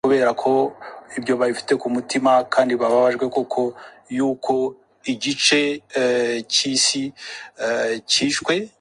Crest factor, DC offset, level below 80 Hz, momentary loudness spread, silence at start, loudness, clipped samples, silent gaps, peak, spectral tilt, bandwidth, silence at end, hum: 18 dB; under 0.1%; -64 dBFS; 11 LU; 0.05 s; -20 LUFS; under 0.1%; none; -2 dBFS; -2.5 dB/octave; 11.5 kHz; 0.15 s; none